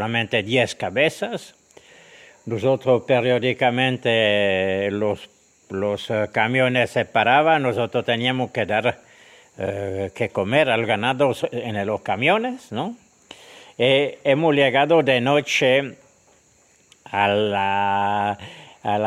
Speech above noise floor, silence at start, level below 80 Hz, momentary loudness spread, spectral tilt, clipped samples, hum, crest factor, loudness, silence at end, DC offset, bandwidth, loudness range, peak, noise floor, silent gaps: 37 dB; 0 s; -64 dBFS; 12 LU; -5.5 dB/octave; under 0.1%; none; 18 dB; -20 LUFS; 0 s; under 0.1%; 13.5 kHz; 4 LU; -2 dBFS; -57 dBFS; none